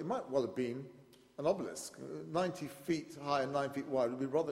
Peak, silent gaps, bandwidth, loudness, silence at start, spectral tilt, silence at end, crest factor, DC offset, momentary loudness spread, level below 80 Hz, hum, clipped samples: -20 dBFS; none; 16 kHz; -38 LUFS; 0 s; -5.5 dB/octave; 0 s; 18 dB; under 0.1%; 11 LU; -74 dBFS; none; under 0.1%